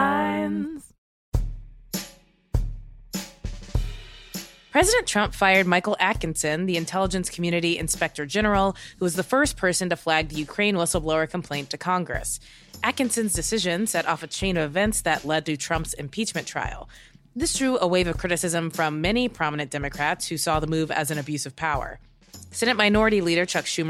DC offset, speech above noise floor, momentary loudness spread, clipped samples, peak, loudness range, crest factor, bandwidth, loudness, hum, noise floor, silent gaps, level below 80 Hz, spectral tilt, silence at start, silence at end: under 0.1%; 26 dB; 13 LU; under 0.1%; -4 dBFS; 5 LU; 20 dB; 16 kHz; -24 LUFS; none; -50 dBFS; 0.98-1.32 s; -38 dBFS; -3.5 dB/octave; 0 s; 0 s